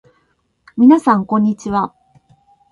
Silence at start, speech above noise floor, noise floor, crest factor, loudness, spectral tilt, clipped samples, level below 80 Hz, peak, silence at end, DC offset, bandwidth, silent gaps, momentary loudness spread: 0.75 s; 50 dB; -63 dBFS; 16 dB; -14 LUFS; -7.5 dB/octave; under 0.1%; -54 dBFS; 0 dBFS; 0.85 s; under 0.1%; 11 kHz; none; 13 LU